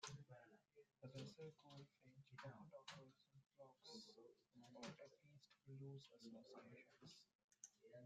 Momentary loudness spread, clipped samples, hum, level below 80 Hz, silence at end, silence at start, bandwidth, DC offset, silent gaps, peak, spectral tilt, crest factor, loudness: 9 LU; under 0.1%; none; under -90 dBFS; 0 s; 0 s; 9 kHz; under 0.1%; 7.35-7.48 s; -40 dBFS; -4.5 dB/octave; 24 dB; -62 LUFS